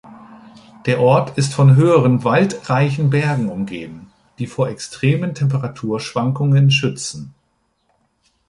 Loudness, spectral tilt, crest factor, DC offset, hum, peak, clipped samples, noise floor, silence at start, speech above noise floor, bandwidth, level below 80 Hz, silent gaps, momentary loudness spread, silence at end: -17 LUFS; -6.5 dB/octave; 16 dB; under 0.1%; none; -2 dBFS; under 0.1%; -65 dBFS; 0.05 s; 50 dB; 11.5 kHz; -54 dBFS; none; 14 LU; 1.2 s